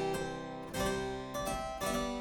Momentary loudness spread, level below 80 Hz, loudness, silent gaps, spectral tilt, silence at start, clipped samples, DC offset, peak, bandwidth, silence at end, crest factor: 6 LU; -50 dBFS; -37 LUFS; none; -4 dB/octave; 0 s; under 0.1%; under 0.1%; -22 dBFS; over 20 kHz; 0 s; 14 dB